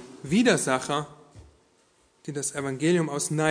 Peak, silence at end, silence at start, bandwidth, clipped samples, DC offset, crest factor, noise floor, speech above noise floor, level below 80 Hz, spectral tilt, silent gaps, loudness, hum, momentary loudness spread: -8 dBFS; 0 s; 0 s; 11 kHz; under 0.1%; under 0.1%; 20 dB; -64 dBFS; 39 dB; -62 dBFS; -4.5 dB/octave; none; -25 LUFS; none; 13 LU